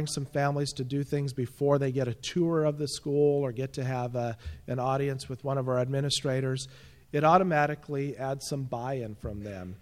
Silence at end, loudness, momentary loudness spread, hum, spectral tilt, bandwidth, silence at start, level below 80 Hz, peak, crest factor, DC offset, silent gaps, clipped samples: 0.05 s; -29 LUFS; 10 LU; none; -5.5 dB/octave; 15 kHz; 0 s; -56 dBFS; -8 dBFS; 20 dB; under 0.1%; none; under 0.1%